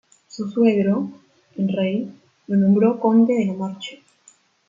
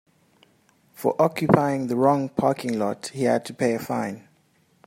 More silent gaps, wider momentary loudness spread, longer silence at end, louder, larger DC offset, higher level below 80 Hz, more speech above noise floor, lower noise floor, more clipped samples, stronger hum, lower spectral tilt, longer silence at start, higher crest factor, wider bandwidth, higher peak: neither; first, 18 LU vs 8 LU; about the same, 0.75 s vs 0.7 s; first, -20 LUFS vs -23 LUFS; neither; about the same, -68 dBFS vs -64 dBFS; about the same, 37 dB vs 40 dB; second, -56 dBFS vs -63 dBFS; neither; neither; first, -8 dB/octave vs -6.5 dB/octave; second, 0.35 s vs 1 s; second, 16 dB vs 22 dB; second, 7.6 kHz vs 16 kHz; about the same, -4 dBFS vs -2 dBFS